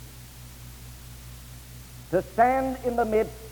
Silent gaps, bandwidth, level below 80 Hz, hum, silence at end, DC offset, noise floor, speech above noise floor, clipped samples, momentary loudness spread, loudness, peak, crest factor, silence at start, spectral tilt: none; over 20 kHz; -46 dBFS; 60 Hz at -45 dBFS; 0 s; under 0.1%; -44 dBFS; 20 dB; under 0.1%; 21 LU; -25 LUFS; -8 dBFS; 20 dB; 0 s; -6 dB/octave